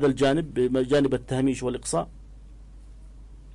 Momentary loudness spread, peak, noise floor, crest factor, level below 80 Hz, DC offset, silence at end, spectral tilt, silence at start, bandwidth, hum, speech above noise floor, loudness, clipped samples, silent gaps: 7 LU; -14 dBFS; -45 dBFS; 12 dB; -46 dBFS; under 0.1%; 0 s; -5.5 dB/octave; 0 s; 11.5 kHz; none; 21 dB; -25 LUFS; under 0.1%; none